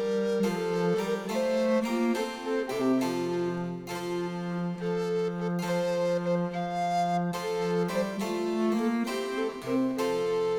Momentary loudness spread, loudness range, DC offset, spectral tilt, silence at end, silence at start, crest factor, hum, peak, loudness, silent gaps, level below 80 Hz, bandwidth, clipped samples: 5 LU; 2 LU; under 0.1%; -6 dB/octave; 0 s; 0 s; 12 dB; none; -16 dBFS; -29 LUFS; none; -64 dBFS; 19 kHz; under 0.1%